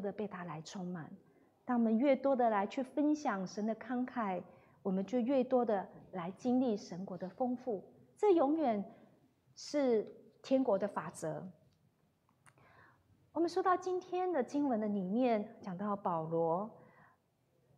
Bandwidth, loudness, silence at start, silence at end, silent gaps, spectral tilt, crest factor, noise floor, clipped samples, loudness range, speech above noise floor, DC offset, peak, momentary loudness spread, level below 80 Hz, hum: 11 kHz; -36 LUFS; 0 s; 1 s; none; -7 dB/octave; 18 dB; -75 dBFS; under 0.1%; 4 LU; 40 dB; under 0.1%; -18 dBFS; 14 LU; -82 dBFS; none